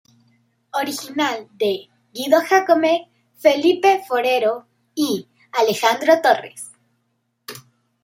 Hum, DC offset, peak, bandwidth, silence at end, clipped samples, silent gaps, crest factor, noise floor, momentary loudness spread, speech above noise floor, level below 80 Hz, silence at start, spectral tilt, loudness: none; under 0.1%; -2 dBFS; 16 kHz; 0.45 s; under 0.1%; none; 18 dB; -70 dBFS; 20 LU; 52 dB; -72 dBFS; 0.75 s; -3 dB/octave; -19 LUFS